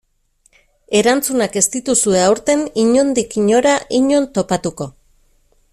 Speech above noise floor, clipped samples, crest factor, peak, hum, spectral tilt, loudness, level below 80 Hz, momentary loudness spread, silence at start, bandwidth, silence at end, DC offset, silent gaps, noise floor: 44 dB; under 0.1%; 16 dB; 0 dBFS; none; -3.5 dB/octave; -15 LUFS; -50 dBFS; 6 LU; 0.9 s; 15.5 kHz; 0.85 s; under 0.1%; none; -59 dBFS